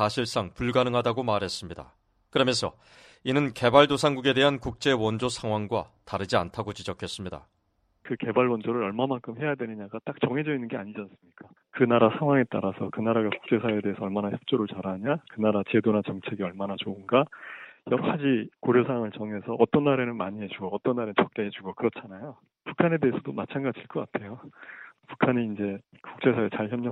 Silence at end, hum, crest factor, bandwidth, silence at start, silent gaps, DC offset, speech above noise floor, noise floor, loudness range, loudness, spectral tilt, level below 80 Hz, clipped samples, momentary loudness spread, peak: 0 s; none; 24 dB; 12.5 kHz; 0 s; none; under 0.1%; 44 dB; -71 dBFS; 6 LU; -27 LUFS; -6 dB/octave; -60 dBFS; under 0.1%; 15 LU; -4 dBFS